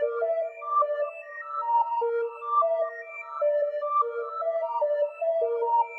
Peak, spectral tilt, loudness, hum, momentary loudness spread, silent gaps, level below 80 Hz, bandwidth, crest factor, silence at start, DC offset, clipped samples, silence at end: -14 dBFS; -2 dB/octave; -27 LUFS; none; 7 LU; none; under -90 dBFS; 4.4 kHz; 12 dB; 0 s; under 0.1%; under 0.1%; 0 s